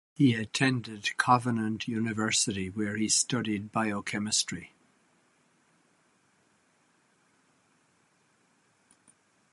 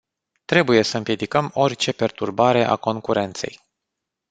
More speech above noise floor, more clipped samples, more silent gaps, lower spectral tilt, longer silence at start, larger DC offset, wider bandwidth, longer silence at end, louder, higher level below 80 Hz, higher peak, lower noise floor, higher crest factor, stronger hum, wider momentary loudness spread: second, 40 dB vs 62 dB; neither; neither; second, -3.5 dB/octave vs -5 dB/octave; second, 0.2 s vs 0.5 s; neither; first, 11.5 kHz vs 9.4 kHz; first, 4.85 s vs 0.8 s; second, -28 LUFS vs -20 LUFS; about the same, -64 dBFS vs -60 dBFS; second, -8 dBFS vs -2 dBFS; second, -69 dBFS vs -82 dBFS; about the same, 24 dB vs 20 dB; neither; about the same, 8 LU vs 7 LU